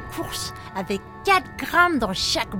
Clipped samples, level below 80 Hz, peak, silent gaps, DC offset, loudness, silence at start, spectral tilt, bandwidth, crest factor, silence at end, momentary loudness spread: under 0.1%; -44 dBFS; -4 dBFS; none; under 0.1%; -22 LUFS; 0 s; -3 dB/octave; 17 kHz; 20 dB; 0 s; 11 LU